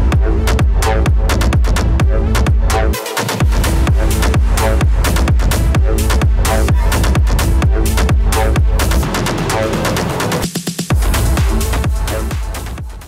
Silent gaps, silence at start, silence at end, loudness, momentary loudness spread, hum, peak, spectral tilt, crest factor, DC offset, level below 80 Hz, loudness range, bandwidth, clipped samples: none; 0 s; 0 s; -15 LUFS; 4 LU; none; -6 dBFS; -5 dB/octave; 8 dB; under 0.1%; -14 dBFS; 2 LU; 16.5 kHz; under 0.1%